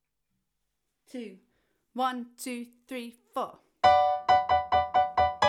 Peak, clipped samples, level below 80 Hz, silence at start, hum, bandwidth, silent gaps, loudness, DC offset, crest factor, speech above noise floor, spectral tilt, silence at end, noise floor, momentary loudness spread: -8 dBFS; under 0.1%; -56 dBFS; 1.15 s; none; 14.5 kHz; none; -27 LUFS; under 0.1%; 20 dB; 46 dB; -4 dB/octave; 0 s; -82 dBFS; 19 LU